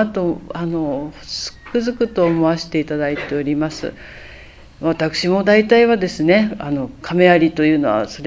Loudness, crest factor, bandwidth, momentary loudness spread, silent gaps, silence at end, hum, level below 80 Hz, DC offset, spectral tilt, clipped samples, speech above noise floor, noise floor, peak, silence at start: -17 LUFS; 18 dB; 7.8 kHz; 13 LU; none; 0 s; none; -46 dBFS; under 0.1%; -6 dB/octave; under 0.1%; 23 dB; -40 dBFS; 0 dBFS; 0 s